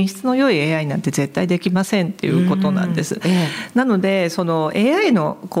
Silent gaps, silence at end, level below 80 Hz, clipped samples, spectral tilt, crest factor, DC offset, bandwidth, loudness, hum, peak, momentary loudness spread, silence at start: none; 0 s; -62 dBFS; under 0.1%; -6 dB/octave; 14 dB; under 0.1%; 15.5 kHz; -18 LUFS; none; -4 dBFS; 5 LU; 0 s